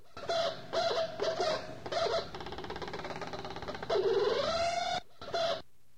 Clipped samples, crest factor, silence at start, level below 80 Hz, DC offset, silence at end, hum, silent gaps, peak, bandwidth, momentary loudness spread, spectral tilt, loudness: under 0.1%; 14 dB; 0.15 s; -60 dBFS; 0.4%; 0.35 s; none; none; -20 dBFS; 14 kHz; 11 LU; -3.5 dB/octave; -34 LUFS